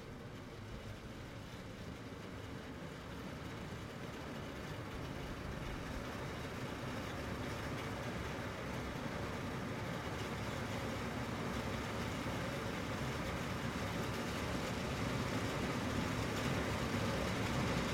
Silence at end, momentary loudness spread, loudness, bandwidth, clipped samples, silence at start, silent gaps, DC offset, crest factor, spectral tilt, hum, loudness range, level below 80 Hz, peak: 0 s; 11 LU; -42 LUFS; 16.5 kHz; under 0.1%; 0 s; none; under 0.1%; 18 dB; -5 dB/octave; none; 9 LU; -54 dBFS; -24 dBFS